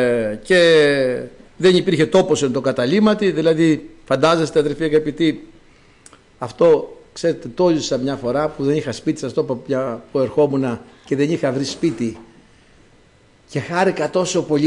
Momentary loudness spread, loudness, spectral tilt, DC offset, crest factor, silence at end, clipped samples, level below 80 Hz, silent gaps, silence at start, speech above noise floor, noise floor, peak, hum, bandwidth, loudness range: 9 LU; -18 LUFS; -5.5 dB/octave; under 0.1%; 14 dB; 0 s; under 0.1%; -52 dBFS; none; 0 s; 35 dB; -52 dBFS; -4 dBFS; none; 11 kHz; 6 LU